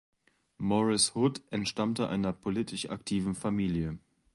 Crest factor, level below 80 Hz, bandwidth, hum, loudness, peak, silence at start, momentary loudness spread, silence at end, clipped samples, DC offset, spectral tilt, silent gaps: 18 dB; -56 dBFS; 11.5 kHz; none; -31 LUFS; -12 dBFS; 0.6 s; 10 LU; 0.35 s; under 0.1%; under 0.1%; -4.5 dB/octave; none